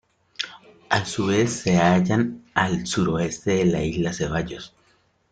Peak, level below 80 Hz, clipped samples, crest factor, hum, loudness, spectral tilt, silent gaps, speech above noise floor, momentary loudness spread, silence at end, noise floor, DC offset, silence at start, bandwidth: -4 dBFS; -48 dBFS; under 0.1%; 20 dB; none; -23 LUFS; -5.5 dB/octave; none; 41 dB; 13 LU; 0.65 s; -63 dBFS; under 0.1%; 0.4 s; 9.4 kHz